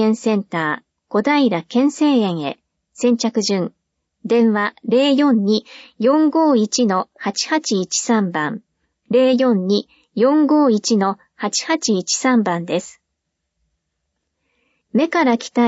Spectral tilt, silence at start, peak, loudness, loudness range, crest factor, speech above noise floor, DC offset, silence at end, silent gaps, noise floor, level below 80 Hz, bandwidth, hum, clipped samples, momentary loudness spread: -4.5 dB/octave; 0 s; -4 dBFS; -17 LUFS; 4 LU; 14 dB; 59 dB; under 0.1%; 0 s; none; -76 dBFS; -70 dBFS; 8 kHz; none; under 0.1%; 9 LU